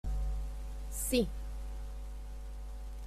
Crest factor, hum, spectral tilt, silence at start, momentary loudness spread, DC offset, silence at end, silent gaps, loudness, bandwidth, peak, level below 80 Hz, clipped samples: 20 dB; none; -4.5 dB/octave; 0.05 s; 14 LU; under 0.1%; 0 s; none; -39 LUFS; 15.5 kHz; -16 dBFS; -40 dBFS; under 0.1%